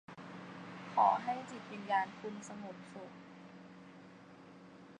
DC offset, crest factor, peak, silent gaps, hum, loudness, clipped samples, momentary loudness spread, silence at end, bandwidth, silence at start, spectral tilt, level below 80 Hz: under 0.1%; 22 dB; -16 dBFS; none; none; -37 LUFS; under 0.1%; 25 LU; 0 s; 10 kHz; 0.1 s; -5 dB/octave; -84 dBFS